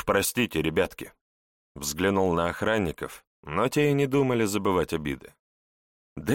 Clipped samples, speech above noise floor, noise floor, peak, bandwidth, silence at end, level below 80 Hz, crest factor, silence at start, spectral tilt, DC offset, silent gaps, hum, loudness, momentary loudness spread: under 0.1%; over 64 dB; under -90 dBFS; -10 dBFS; 17 kHz; 0 s; -50 dBFS; 18 dB; 0 s; -5 dB/octave; under 0.1%; 1.21-1.75 s, 3.27-3.43 s, 5.39-6.16 s; none; -26 LUFS; 15 LU